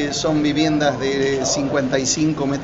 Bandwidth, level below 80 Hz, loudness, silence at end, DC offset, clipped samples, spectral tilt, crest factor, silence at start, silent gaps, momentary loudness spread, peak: 8 kHz; -44 dBFS; -19 LUFS; 0 s; under 0.1%; under 0.1%; -4.5 dB/octave; 16 dB; 0 s; none; 2 LU; -4 dBFS